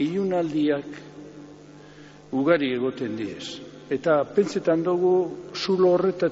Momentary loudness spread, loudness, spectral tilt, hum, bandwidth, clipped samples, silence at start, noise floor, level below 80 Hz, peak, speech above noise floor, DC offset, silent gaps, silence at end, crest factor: 19 LU; -24 LUFS; -5 dB/octave; 50 Hz at -50 dBFS; 8 kHz; under 0.1%; 0 s; -46 dBFS; -66 dBFS; -8 dBFS; 23 dB; under 0.1%; none; 0 s; 16 dB